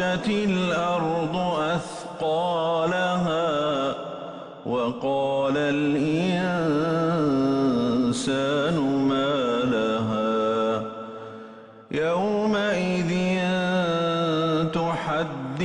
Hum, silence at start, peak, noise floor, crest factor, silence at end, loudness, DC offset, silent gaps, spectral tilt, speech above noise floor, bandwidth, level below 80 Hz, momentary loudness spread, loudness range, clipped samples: none; 0 s; -14 dBFS; -44 dBFS; 10 dB; 0 s; -24 LUFS; under 0.1%; none; -6 dB/octave; 20 dB; 11 kHz; -58 dBFS; 7 LU; 3 LU; under 0.1%